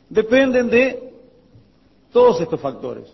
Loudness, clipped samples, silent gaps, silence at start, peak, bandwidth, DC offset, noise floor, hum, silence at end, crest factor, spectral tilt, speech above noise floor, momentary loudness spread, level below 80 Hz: -17 LUFS; under 0.1%; none; 0.1 s; -2 dBFS; 6 kHz; under 0.1%; -55 dBFS; none; 0.1 s; 16 dB; -6 dB/octave; 38 dB; 13 LU; -52 dBFS